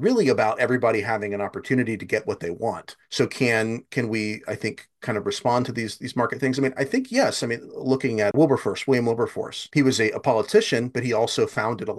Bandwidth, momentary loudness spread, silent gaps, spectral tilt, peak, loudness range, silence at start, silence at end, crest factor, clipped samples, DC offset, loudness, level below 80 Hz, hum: 12.5 kHz; 9 LU; none; -5 dB/octave; -6 dBFS; 4 LU; 0 s; 0 s; 18 dB; under 0.1%; under 0.1%; -23 LUFS; -64 dBFS; none